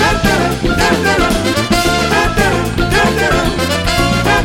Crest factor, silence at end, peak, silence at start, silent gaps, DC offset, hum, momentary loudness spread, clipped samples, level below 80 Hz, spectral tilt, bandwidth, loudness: 12 dB; 0 s; 0 dBFS; 0 s; none; under 0.1%; none; 3 LU; under 0.1%; -22 dBFS; -4.5 dB/octave; 17 kHz; -13 LUFS